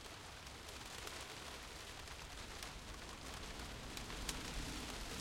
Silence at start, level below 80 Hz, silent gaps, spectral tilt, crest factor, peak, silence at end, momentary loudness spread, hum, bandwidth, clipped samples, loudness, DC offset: 0 s; -56 dBFS; none; -2.5 dB/octave; 24 dB; -24 dBFS; 0 s; 6 LU; none; 16.5 kHz; under 0.1%; -49 LUFS; under 0.1%